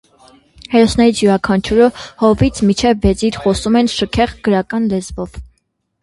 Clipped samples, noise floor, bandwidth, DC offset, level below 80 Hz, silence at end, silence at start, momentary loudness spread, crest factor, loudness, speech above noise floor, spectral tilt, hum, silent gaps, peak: under 0.1%; -65 dBFS; 11.5 kHz; under 0.1%; -32 dBFS; 0.55 s; 0.7 s; 6 LU; 14 dB; -14 LUFS; 52 dB; -5.5 dB/octave; none; none; 0 dBFS